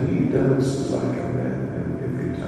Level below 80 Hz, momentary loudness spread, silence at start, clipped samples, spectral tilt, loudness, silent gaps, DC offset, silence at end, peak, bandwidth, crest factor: -46 dBFS; 7 LU; 0 s; under 0.1%; -8 dB/octave; -23 LUFS; none; under 0.1%; 0 s; -8 dBFS; 11.5 kHz; 14 dB